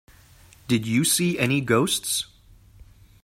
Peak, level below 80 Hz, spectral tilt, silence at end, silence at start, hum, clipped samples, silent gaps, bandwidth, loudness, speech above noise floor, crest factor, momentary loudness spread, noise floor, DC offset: -6 dBFS; -54 dBFS; -4 dB/octave; 0.4 s; 0.7 s; none; under 0.1%; none; 16 kHz; -22 LUFS; 29 dB; 20 dB; 6 LU; -52 dBFS; under 0.1%